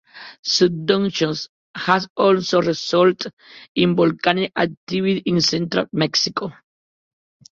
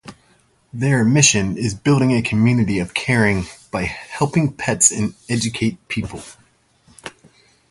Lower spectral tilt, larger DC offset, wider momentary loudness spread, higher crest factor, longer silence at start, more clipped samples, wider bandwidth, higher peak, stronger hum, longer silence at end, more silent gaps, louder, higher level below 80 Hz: about the same, -4.5 dB/octave vs -4 dB/octave; neither; second, 12 LU vs 17 LU; about the same, 18 dB vs 20 dB; about the same, 0.15 s vs 0.05 s; neither; second, 7.6 kHz vs 11.5 kHz; about the same, -2 dBFS vs 0 dBFS; neither; first, 1.05 s vs 0.6 s; first, 0.39-0.43 s, 1.49-1.74 s, 2.10-2.16 s, 3.33-3.37 s, 3.69-3.75 s, 4.77-4.87 s vs none; about the same, -19 LUFS vs -18 LUFS; second, -60 dBFS vs -44 dBFS